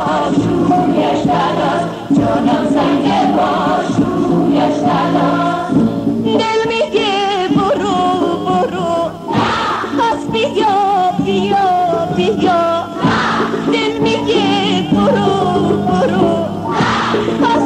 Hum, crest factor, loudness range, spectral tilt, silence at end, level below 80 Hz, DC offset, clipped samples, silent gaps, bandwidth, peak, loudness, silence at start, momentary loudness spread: none; 12 dB; 1 LU; -6 dB/octave; 0 s; -42 dBFS; under 0.1%; under 0.1%; none; 10.5 kHz; 0 dBFS; -14 LUFS; 0 s; 3 LU